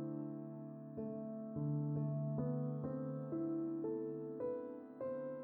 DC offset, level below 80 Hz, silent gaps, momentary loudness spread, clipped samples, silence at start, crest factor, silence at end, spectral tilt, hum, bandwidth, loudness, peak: under 0.1%; -76 dBFS; none; 7 LU; under 0.1%; 0 s; 12 dB; 0 s; -13 dB/octave; none; 2.6 kHz; -43 LUFS; -30 dBFS